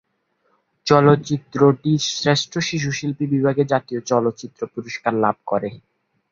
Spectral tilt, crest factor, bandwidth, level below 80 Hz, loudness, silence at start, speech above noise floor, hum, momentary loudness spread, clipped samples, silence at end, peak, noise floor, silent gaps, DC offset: -5.5 dB/octave; 18 dB; 7.6 kHz; -58 dBFS; -20 LUFS; 0.85 s; 48 dB; none; 12 LU; under 0.1%; 0.5 s; -2 dBFS; -68 dBFS; none; under 0.1%